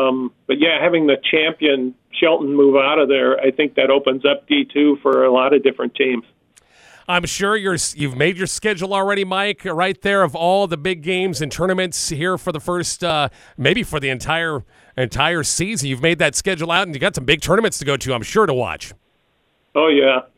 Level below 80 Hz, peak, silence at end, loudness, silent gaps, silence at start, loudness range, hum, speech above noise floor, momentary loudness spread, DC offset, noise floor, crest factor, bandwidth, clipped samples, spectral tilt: -46 dBFS; 0 dBFS; 0.15 s; -17 LUFS; none; 0 s; 4 LU; none; 46 dB; 8 LU; under 0.1%; -63 dBFS; 18 dB; 15.5 kHz; under 0.1%; -4 dB/octave